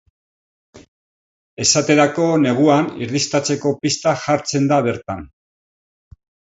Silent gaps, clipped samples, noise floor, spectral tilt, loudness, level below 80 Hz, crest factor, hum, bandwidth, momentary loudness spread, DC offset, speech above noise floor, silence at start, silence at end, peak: 0.88-1.57 s; under 0.1%; under -90 dBFS; -4 dB/octave; -17 LUFS; -54 dBFS; 18 dB; none; 8 kHz; 8 LU; under 0.1%; over 73 dB; 0.75 s; 1.3 s; 0 dBFS